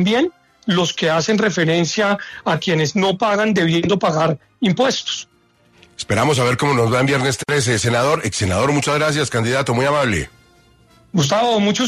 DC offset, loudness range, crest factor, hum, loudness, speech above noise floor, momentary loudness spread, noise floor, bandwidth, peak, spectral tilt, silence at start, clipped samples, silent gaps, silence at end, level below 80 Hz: under 0.1%; 2 LU; 14 dB; none; -17 LUFS; 37 dB; 6 LU; -54 dBFS; 13.5 kHz; -4 dBFS; -4.5 dB/octave; 0 s; under 0.1%; none; 0 s; -48 dBFS